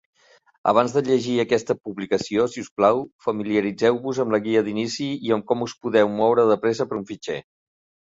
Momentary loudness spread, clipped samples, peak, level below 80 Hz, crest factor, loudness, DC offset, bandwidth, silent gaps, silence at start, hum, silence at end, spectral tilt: 9 LU; under 0.1%; -4 dBFS; -62 dBFS; 18 dB; -22 LUFS; under 0.1%; 7.8 kHz; 2.71-2.76 s, 3.12-3.19 s; 0.65 s; none; 0.7 s; -5.5 dB/octave